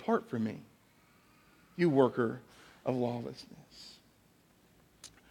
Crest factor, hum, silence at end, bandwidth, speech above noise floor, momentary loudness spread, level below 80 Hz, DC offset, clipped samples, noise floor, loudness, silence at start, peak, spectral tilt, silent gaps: 24 dB; none; 0.25 s; 17 kHz; 33 dB; 25 LU; -74 dBFS; under 0.1%; under 0.1%; -66 dBFS; -33 LUFS; 0 s; -12 dBFS; -7.5 dB/octave; none